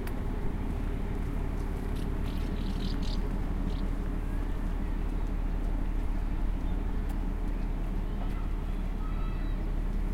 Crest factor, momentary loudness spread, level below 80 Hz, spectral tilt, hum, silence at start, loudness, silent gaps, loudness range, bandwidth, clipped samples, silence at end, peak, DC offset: 12 dB; 2 LU; -32 dBFS; -7.5 dB/octave; none; 0 s; -35 LUFS; none; 1 LU; 6.6 kHz; under 0.1%; 0 s; -18 dBFS; under 0.1%